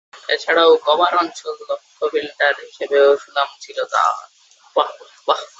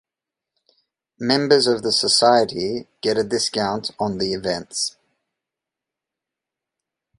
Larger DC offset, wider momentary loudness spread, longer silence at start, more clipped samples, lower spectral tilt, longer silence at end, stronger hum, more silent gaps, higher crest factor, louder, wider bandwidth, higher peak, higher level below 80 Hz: neither; first, 13 LU vs 10 LU; second, 0.15 s vs 1.2 s; neither; second, -1.5 dB/octave vs -3 dB/octave; second, 0.15 s vs 2.3 s; neither; neither; about the same, 18 dB vs 22 dB; about the same, -18 LUFS vs -20 LUFS; second, 8 kHz vs 11.5 kHz; about the same, -2 dBFS vs -2 dBFS; second, -72 dBFS vs -58 dBFS